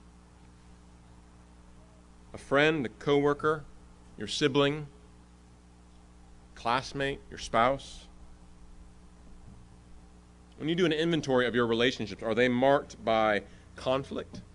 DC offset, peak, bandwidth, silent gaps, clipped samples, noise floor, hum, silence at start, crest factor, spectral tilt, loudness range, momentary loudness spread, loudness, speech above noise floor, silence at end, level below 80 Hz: under 0.1%; -10 dBFS; 11 kHz; none; under 0.1%; -55 dBFS; 60 Hz at -55 dBFS; 2.35 s; 20 dB; -5 dB/octave; 7 LU; 14 LU; -29 LUFS; 27 dB; 0.15 s; -54 dBFS